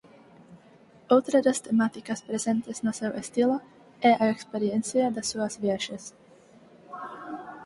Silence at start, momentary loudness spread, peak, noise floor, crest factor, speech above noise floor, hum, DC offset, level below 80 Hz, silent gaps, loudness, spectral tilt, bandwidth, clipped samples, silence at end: 0.5 s; 17 LU; -6 dBFS; -55 dBFS; 22 dB; 29 dB; none; under 0.1%; -70 dBFS; none; -26 LUFS; -4.5 dB/octave; 11.5 kHz; under 0.1%; 0 s